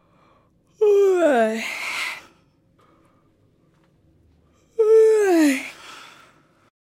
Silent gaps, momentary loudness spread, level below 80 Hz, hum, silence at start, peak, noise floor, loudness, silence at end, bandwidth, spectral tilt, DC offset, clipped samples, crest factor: none; 22 LU; -70 dBFS; none; 0.8 s; -8 dBFS; -60 dBFS; -18 LUFS; 1 s; 15.5 kHz; -3.5 dB/octave; under 0.1%; under 0.1%; 14 dB